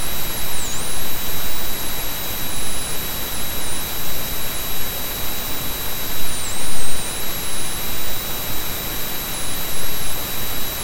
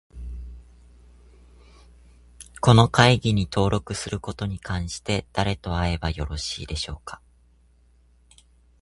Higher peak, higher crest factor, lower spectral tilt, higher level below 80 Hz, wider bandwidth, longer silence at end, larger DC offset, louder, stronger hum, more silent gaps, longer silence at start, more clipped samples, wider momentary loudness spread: about the same, -2 dBFS vs 0 dBFS; second, 12 dB vs 26 dB; second, -2 dB/octave vs -5.5 dB/octave; about the same, -34 dBFS vs -38 dBFS; first, 17 kHz vs 11.5 kHz; second, 0 s vs 1.65 s; neither; about the same, -24 LUFS vs -23 LUFS; neither; neither; second, 0 s vs 0.15 s; neither; second, 0 LU vs 22 LU